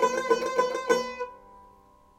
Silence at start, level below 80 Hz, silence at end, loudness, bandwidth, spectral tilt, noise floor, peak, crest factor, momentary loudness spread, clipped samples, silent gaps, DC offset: 0 s; -64 dBFS; 0.55 s; -27 LUFS; 15.5 kHz; -2.5 dB/octave; -57 dBFS; -10 dBFS; 18 dB; 12 LU; under 0.1%; none; under 0.1%